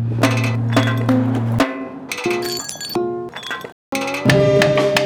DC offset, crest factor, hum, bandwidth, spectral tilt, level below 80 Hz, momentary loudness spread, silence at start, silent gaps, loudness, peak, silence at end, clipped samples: under 0.1%; 14 dB; none; 20 kHz; -5.5 dB/octave; -48 dBFS; 13 LU; 0 s; 3.72-3.92 s; -18 LUFS; -4 dBFS; 0 s; under 0.1%